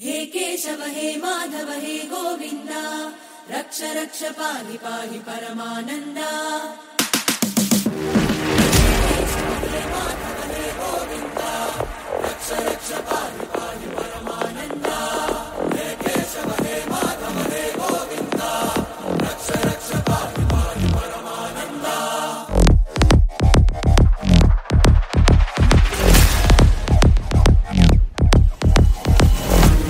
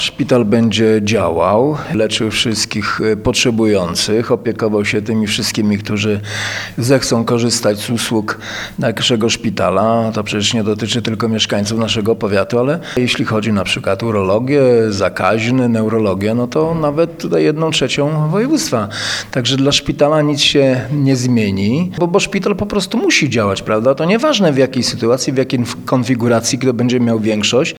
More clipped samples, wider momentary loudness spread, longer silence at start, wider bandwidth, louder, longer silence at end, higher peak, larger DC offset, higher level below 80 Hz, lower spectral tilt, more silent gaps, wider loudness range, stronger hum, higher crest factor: neither; first, 12 LU vs 5 LU; about the same, 0 s vs 0 s; second, 16.5 kHz vs 18.5 kHz; second, -20 LUFS vs -14 LUFS; about the same, 0 s vs 0.05 s; about the same, 0 dBFS vs 0 dBFS; second, under 0.1% vs 0.1%; first, -22 dBFS vs -44 dBFS; about the same, -5 dB/octave vs -4.5 dB/octave; neither; first, 11 LU vs 2 LU; neither; about the same, 18 dB vs 14 dB